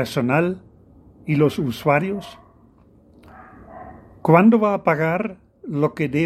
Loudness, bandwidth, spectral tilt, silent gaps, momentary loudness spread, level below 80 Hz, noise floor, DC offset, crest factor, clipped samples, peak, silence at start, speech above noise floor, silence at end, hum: -19 LUFS; 14 kHz; -7.5 dB/octave; none; 24 LU; -56 dBFS; -52 dBFS; under 0.1%; 20 dB; under 0.1%; 0 dBFS; 0 s; 33 dB; 0 s; none